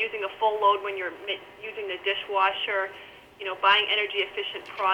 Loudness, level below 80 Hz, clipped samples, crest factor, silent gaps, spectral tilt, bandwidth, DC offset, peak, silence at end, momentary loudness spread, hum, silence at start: -26 LUFS; -68 dBFS; under 0.1%; 18 dB; none; -3 dB/octave; 17.5 kHz; under 0.1%; -8 dBFS; 0 s; 14 LU; none; 0 s